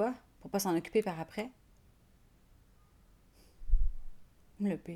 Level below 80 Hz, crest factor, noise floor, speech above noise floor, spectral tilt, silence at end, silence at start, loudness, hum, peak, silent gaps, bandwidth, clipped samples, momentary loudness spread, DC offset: -40 dBFS; 20 dB; -64 dBFS; 29 dB; -5.5 dB/octave; 0 s; 0 s; -36 LUFS; none; -14 dBFS; none; 14 kHz; under 0.1%; 14 LU; under 0.1%